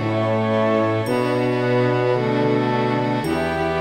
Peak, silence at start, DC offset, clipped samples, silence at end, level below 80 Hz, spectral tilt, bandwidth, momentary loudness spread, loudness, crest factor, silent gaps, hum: -6 dBFS; 0 s; under 0.1%; under 0.1%; 0 s; -48 dBFS; -7.5 dB/octave; 15.5 kHz; 3 LU; -20 LUFS; 12 dB; none; none